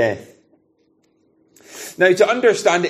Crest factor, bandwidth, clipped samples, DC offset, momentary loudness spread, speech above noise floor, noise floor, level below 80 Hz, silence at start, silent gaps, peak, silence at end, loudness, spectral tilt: 18 dB; 15 kHz; under 0.1%; under 0.1%; 20 LU; 46 dB; -61 dBFS; -68 dBFS; 0 s; none; -2 dBFS; 0 s; -16 LUFS; -4 dB/octave